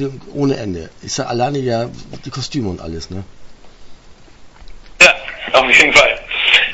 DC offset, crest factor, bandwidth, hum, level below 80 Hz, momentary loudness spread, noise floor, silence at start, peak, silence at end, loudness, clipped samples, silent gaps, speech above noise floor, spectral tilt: under 0.1%; 16 dB; 11 kHz; none; -42 dBFS; 20 LU; -39 dBFS; 0 s; 0 dBFS; 0 s; -13 LUFS; 0.2%; none; 23 dB; -3 dB/octave